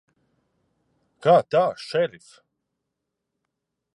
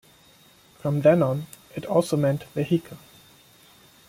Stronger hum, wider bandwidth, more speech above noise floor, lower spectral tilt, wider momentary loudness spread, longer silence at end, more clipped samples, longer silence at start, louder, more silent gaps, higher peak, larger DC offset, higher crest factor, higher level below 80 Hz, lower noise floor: neither; second, 11 kHz vs 16.5 kHz; first, 60 dB vs 32 dB; second, -6 dB/octave vs -7.5 dB/octave; second, 8 LU vs 18 LU; first, 1.9 s vs 1.1 s; neither; first, 1.25 s vs 0.85 s; about the same, -22 LUFS vs -24 LUFS; neither; about the same, -6 dBFS vs -6 dBFS; neither; about the same, 22 dB vs 20 dB; second, -76 dBFS vs -62 dBFS; first, -82 dBFS vs -55 dBFS